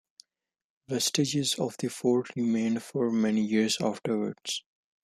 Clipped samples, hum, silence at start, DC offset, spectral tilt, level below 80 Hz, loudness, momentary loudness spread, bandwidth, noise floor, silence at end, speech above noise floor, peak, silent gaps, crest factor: under 0.1%; none; 0.9 s; under 0.1%; -4 dB/octave; -72 dBFS; -28 LUFS; 6 LU; 15 kHz; -83 dBFS; 0.45 s; 55 dB; -12 dBFS; none; 18 dB